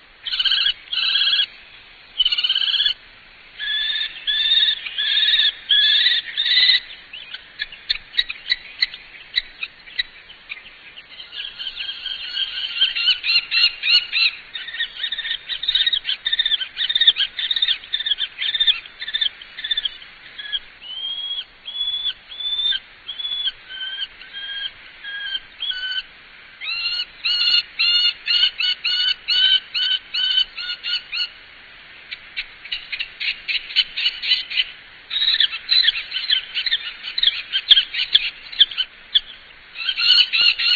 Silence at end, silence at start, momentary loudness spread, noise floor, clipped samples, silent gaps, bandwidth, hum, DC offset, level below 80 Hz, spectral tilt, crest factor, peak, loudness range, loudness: 0 s; 0.25 s; 16 LU; -45 dBFS; under 0.1%; none; 5.4 kHz; none; under 0.1%; -54 dBFS; 1 dB/octave; 22 dB; 0 dBFS; 9 LU; -18 LUFS